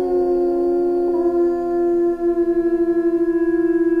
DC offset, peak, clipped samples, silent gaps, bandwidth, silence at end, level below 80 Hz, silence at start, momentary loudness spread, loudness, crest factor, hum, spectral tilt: under 0.1%; -10 dBFS; under 0.1%; none; 4.6 kHz; 0 s; -46 dBFS; 0 s; 1 LU; -18 LUFS; 8 dB; none; -8.5 dB/octave